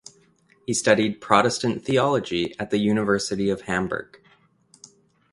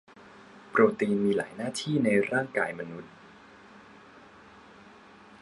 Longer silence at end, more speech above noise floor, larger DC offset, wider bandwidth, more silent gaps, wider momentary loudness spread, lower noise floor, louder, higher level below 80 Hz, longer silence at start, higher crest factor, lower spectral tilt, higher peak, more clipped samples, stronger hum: second, 1.3 s vs 1.65 s; first, 37 dB vs 26 dB; neither; about the same, 11.5 kHz vs 11.5 kHz; neither; second, 8 LU vs 16 LU; first, -60 dBFS vs -53 dBFS; first, -23 LUFS vs -27 LUFS; first, -56 dBFS vs -70 dBFS; first, 0.7 s vs 0.25 s; about the same, 24 dB vs 22 dB; second, -4.5 dB/octave vs -6 dB/octave; first, 0 dBFS vs -8 dBFS; neither; neither